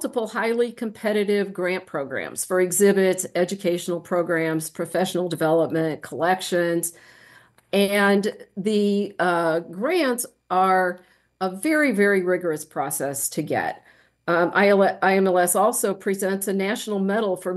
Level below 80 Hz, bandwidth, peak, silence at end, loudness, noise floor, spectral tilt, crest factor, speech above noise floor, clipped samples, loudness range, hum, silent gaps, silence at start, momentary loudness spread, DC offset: -72 dBFS; 13 kHz; -6 dBFS; 0 s; -22 LUFS; -53 dBFS; -4.5 dB/octave; 16 dB; 31 dB; under 0.1%; 3 LU; none; none; 0 s; 9 LU; under 0.1%